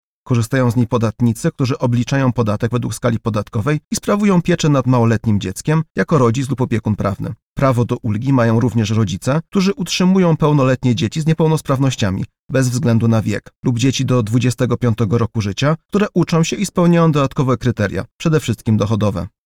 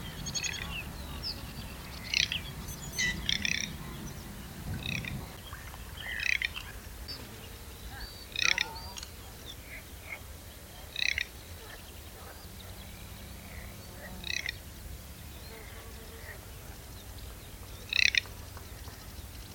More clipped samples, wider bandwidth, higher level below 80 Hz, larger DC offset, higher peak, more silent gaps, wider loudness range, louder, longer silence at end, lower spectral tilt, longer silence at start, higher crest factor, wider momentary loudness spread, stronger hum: neither; second, 15 kHz vs 19 kHz; first, -42 dBFS vs -48 dBFS; neither; about the same, -2 dBFS vs -4 dBFS; first, 3.84-3.91 s, 5.90-5.95 s, 7.42-7.56 s, 12.39-12.49 s, 13.56-13.63 s, 15.85-15.89 s, 18.12-18.19 s vs none; second, 2 LU vs 8 LU; first, -17 LUFS vs -34 LUFS; first, 0.15 s vs 0 s; first, -6.5 dB/octave vs -2 dB/octave; first, 0.25 s vs 0 s; second, 14 dB vs 34 dB; second, 6 LU vs 17 LU; neither